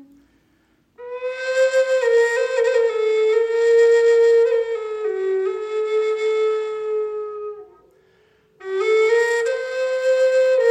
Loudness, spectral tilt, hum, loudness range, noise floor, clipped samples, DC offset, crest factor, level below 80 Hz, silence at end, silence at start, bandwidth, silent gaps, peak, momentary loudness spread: -19 LUFS; -1.5 dB/octave; none; 7 LU; -61 dBFS; under 0.1%; under 0.1%; 12 dB; -70 dBFS; 0 s; 1 s; 10 kHz; none; -6 dBFS; 14 LU